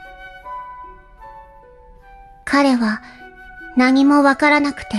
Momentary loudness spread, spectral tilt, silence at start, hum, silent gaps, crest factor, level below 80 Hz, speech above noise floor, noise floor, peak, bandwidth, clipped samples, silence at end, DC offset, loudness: 25 LU; -4.5 dB/octave; 0 s; none; none; 16 dB; -48 dBFS; 29 dB; -44 dBFS; -2 dBFS; 11.5 kHz; under 0.1%; 0 s; under 0.1%; -15 LUFS